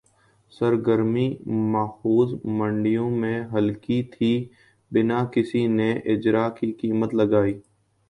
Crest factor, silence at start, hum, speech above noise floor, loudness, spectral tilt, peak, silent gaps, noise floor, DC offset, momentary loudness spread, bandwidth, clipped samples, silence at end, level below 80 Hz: 16 dB; 0.6 s; none; 39 dB; -23 LUFS; -9 dB/octave; -6 dBFS; none; -61 dBFS; under 0.1%; 5 LU; 10 kHz; under 0.1%; 0.5 s; -58 dBFS